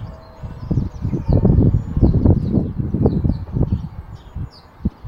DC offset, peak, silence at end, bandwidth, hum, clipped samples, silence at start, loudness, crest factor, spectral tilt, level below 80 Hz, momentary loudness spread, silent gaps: under 0.1%; 0 dBFS; 0 s; 5.6 kHz; none; under 0.1%; 0 s; -19 LUFS; 18 dB; -11.5 dB/octave; -24 dBFS; 20 LU; none